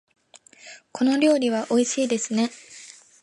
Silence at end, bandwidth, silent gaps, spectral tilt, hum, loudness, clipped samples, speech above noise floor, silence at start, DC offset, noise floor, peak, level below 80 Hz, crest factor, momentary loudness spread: 0.3 s; 11.5 kHz; none; -3.5 dB/octave; none; -22 LUFS; under 0.1%; 30 dB; 0.65 s; under 0.1%; -51 dBFS; -8 dBFS; -76 dBFS; 16 dB; 23 LU